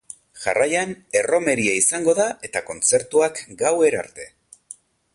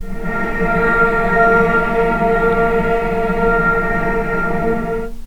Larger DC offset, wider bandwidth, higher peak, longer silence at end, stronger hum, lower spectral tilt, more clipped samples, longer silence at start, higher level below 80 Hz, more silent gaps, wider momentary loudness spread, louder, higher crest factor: neither; second, 11.5 kHz vs 17.5 kHz; second, -6 dBFS vs 0 dBFS; first, 0.85 s vs 0 s; neither; second, -2.5 dB/octave vs -7.5 dB/octave; neither; first, 0.35 s vs 0 s; second, -60 dBFS vs -26 dBFS; neither; first, 20 LU vs 7 LU; second, -20 LUFS vs -16 LUFS; about the same, 16 dB vs 14 dB